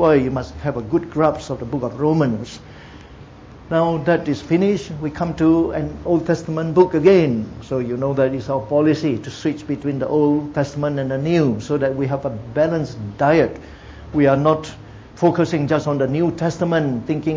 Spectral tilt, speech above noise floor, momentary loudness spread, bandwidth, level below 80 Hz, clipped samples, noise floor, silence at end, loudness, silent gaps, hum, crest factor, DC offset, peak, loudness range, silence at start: -7.5 dB/octave; 22 dB; 9 LU; 7.8 kHz; -44 dBFS; under 0.1%; -40 dBFS; 0 s; -19 LUFS; none; none; 18 dB; under 0.1%; -2 dBFS; 4 LU; 0 s